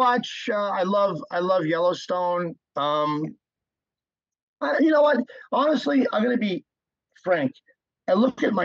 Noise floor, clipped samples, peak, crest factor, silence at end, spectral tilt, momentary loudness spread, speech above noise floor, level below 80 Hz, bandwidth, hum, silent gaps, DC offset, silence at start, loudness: under -90 dBFS; under 0.1%; -8 dBFS; 16 dB; 0 s; -6 dB/octave; 10 LU; over 67 dB; -78 dBFS; 7.6 kHz; none; 4.43-4.54 s; under 0.1%; 0 s; -23 LUFS